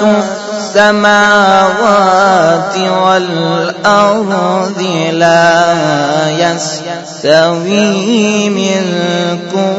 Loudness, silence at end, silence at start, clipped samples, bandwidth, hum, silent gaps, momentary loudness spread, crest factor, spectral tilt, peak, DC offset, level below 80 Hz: -10 LUFS; 0 s; 0 s; 0.4%; 9.6 kHz; none; none; 7 LU; 10 dB; -4.5 dB/octave; 0 dBFS; under 0.1%; -52 dBFS